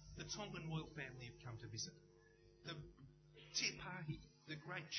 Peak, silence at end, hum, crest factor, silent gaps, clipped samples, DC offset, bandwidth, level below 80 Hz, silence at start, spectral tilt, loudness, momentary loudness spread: -28 dBFS; 0 s; none; 22 dB; none; under 0.1%; under 0.1%; 6.6 kHz; -68 dBFS; 0 s; -3 dB/octave; -49 LUFS; 19 LU